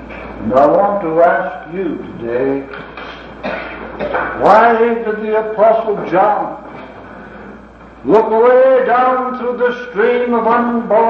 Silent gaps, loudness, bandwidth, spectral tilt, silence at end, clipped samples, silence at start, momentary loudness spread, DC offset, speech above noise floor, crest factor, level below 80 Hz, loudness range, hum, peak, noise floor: none; -14 LUFS; 6.4 kHz; -7.5 dB/octave; 0 s; under 0.1%; 0 s; 20 LU; under 0.1%; 24 dB; 14 dB; -44 dBFS; 4 LU; none; 0 dBFS; -36 dBFS